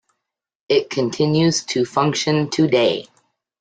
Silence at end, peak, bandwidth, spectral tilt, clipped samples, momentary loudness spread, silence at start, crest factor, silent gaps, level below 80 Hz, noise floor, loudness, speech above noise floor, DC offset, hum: 0.6 s; -4 dBFS; 9.4 kHz; -5 dB/octave; under 0.1%; 4 LU; 0.7 s; 16 dB; none; -60 dBFS; -80 dBFS; -19 LUFS; 62 dB; under 0.1%; none